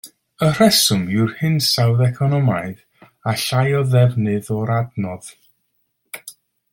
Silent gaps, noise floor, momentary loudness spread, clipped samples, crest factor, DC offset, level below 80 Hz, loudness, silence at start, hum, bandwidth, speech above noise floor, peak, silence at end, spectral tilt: none; -69 dBFS; 17 LU; under 0.1%; 18 dB; under 0.1%; -56 dBFS; -17 LUFS; 0.05 s; none; 17 kHz; 52 dB; -2 dBFS; 0.4 s; -5 dB/octave